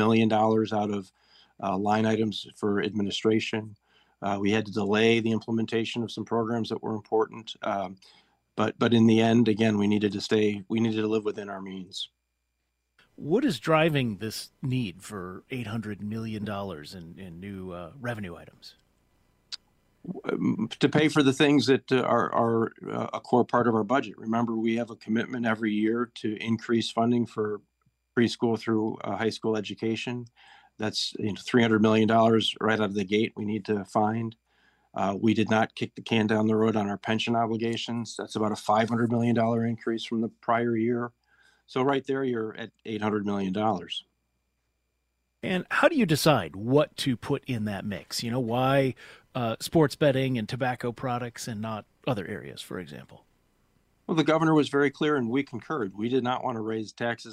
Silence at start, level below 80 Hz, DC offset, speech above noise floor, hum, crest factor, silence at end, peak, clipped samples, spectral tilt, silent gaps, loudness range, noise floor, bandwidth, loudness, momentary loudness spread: 0 s; -66 dBFS; under 0.1%; 52 dB; none; 22 dB; 0 s; -6 dBFS; under 0.1%; -6 dB/octave; none; 8 LU; -79 dBFS; 15.5 kHz; -27 LUFS; 14 LU